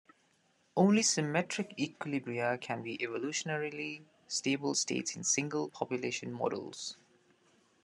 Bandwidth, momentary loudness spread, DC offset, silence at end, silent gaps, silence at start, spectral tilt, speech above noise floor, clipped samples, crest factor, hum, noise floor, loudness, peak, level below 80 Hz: 12 kHz; 12 LU; under 0.1%; 0.9 s; none; 0.75 s; -3.5 dB/octave; 38 dB; under 0.1%; 20 dB; none; -72 dBFS; -34 LUFS; -14 dBFS; -82 dBFS